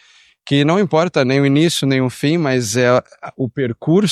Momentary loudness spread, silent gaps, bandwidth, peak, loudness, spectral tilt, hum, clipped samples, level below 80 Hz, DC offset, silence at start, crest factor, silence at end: 7 LU; none; 14 kHz; -2 dBFS; -16 LUFS; -5.5 dB/octave; none; under 0.1%; -58 dBFS; under 0.1%; 0.45 s; 14 dB; 0 s